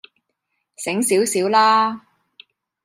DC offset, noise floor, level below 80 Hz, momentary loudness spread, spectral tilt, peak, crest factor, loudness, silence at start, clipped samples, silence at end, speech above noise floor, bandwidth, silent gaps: under 0.1%; -75 dBFS; -76 dBFS; 13 LU; -3 dB/octave; -4 dBFS; 16 dB; -18 LUFS; 0.8 s; under 0.1%; 0.85 s; 58 dB; 15.5 kHz; none